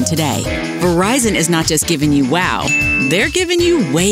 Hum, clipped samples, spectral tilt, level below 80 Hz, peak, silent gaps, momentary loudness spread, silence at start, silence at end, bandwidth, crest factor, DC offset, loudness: none; under 0.1%; -4 dB/octave; -34 dBFS; -2 dBFS; none; 4 LU; 0 s; 0 s; 16 kHz; 14 dB; under 0.1%; -14 LUFS